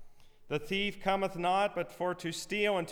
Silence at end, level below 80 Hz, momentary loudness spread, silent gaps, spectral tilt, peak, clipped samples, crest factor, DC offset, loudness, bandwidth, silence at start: 0 s; -56 dBFS; 7 LU; none; -4.5 dB/octave; -18 dBFS; under 0.1%; 16 dB; under 0.1%; -33 LUFS; 19.5 kHz; 0 s